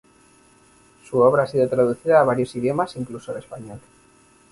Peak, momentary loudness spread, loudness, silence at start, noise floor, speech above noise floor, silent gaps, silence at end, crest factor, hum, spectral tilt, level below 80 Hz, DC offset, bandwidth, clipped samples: -4 dBFS; 17 LU; -20 LUFS; 1.1 s; -55 dBFS; 34 dB; none; 0.75 s; 18 dB; none; -7 dB/octave; -58 dBFS; under 0.1%; 11.5 kHz; under 0.1%